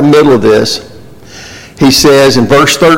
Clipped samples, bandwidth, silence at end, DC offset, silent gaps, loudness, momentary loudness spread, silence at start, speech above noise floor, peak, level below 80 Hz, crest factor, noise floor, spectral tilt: under 0.1%; 17 kHz; 0 s; under 0.1%; none; -6 LUFS; 22 LU; 0 s; 26 dB; 0 dBFS; -36 dBFS; 8 dB; -31 dBFS; -4.5 dB/octave